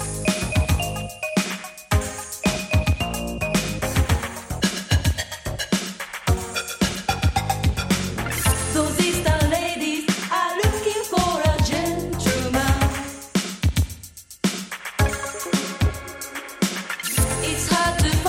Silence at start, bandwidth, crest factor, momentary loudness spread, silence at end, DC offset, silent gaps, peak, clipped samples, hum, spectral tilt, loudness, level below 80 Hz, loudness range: 0 s; 16.5 kHz; 16 dB; 8 LU; 0 s; under 0.1%; none; -6 dBFS; under 0.1%; none; -4.5 dB/octave; -23 LUFS; -30 dBFS; 3 LU